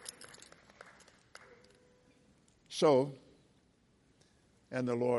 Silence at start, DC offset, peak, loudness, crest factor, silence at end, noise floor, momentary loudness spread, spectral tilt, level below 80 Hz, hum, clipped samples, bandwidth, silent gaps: 0.05 s; under 0.1%; -16 dBFS; -33 LUFS; 22 dB; 0 s; -70 dBFS; 29 LU; -5.5 dB/octave; -78 dBFS; none; under 0.1%; 11.5 kHz; none